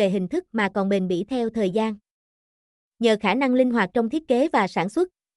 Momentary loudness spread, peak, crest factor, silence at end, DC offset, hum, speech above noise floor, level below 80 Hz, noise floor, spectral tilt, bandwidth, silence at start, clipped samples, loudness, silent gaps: 6 LU; -8 dBFS; 16 dB; 0.3 s; under 0.1%; none; over 68 dB; -62 dBFS; under -90 dBFS; -6.5 dB/octave; 12 kHz; 0 s; under 0.1%; -23 LUFS; 2.11-2.92 s